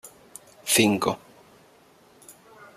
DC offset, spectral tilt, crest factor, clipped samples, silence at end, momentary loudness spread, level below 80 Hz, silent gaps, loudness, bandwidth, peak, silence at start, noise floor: under 0.1%; -3 dB/octave; 24 dB; under 0.1%; 0.45 s; 26 LU; -66 dBFS; none; -23 LUFS; 15 kHz; -4 dBFS; 0.05 s; -56 dBFS